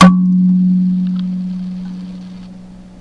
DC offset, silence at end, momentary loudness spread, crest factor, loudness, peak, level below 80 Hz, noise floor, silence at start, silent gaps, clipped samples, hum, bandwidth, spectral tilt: under 0.1%; 0 s; 21 LU; 14 dB; -14 LUFS; 0 dBFS; -46 dBFS; -35 dBFS; 0 s; none; 0.2%; none; 6.8 kHz; -7.5 dB/octave